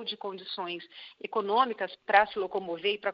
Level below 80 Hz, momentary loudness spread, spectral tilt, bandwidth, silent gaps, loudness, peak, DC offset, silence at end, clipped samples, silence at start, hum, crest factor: -72 dBFS; 14 LU; -6 dB/octave; 5.6 kHz; none; -29 LUFS; -6 dBFS; under 0.1%; 0 s; under 0.1%; 0 s; none; 24 dB